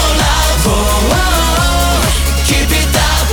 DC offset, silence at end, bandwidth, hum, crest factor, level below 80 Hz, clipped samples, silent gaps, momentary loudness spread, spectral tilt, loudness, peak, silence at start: under 0.1%; 0 s; 19.5 kHz; none; 8 dB; -14 dBFS; under 0.1%; none; 1 LU; -3.5 dB/octave; -12 LUFS; -2 dBFS; 0 s